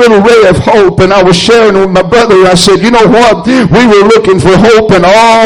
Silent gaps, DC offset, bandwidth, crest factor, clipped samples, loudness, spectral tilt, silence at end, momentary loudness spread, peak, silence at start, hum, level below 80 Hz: none; under 0.1%; 14 kHz; 4 dB; 4%; -4 LUFS; -5 dB/octave; 0 s; 3 LU; 0 dBFS; 0 s; none; -28 dBFS